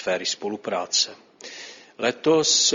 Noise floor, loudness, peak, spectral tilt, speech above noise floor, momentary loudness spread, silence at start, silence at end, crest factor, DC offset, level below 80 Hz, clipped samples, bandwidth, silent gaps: -42 dBFS; -22 LUFS; -6 dBFS; -1.5 dB/octave; 19 dB; 21 LU; 0 s; 0 s; 18 dB; under 0.1%; -72 dBFS; under 0.1%; 7.6 kHz; none